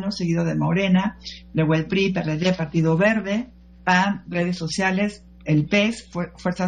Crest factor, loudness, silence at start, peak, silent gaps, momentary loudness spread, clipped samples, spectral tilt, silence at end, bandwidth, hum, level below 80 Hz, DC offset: 18 dB; -22 LUFS; 0 s; -4 dBFS; none; 9 LU; under 0.1%; -6 dB/octave; 0 s; 9.8 kHz; none; -48 dBFS; under 0.1%